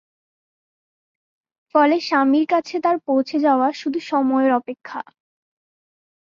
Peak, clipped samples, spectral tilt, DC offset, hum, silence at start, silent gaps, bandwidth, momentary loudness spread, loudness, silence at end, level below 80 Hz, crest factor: -4 dBFS; under 0.1%; -4.5 dB/octave; under 0.1%; none; 1.75 s; none; 7.4 kHz; 15 LU; -19 LUFS; 1.3 s; -72 dBFS; 18 dB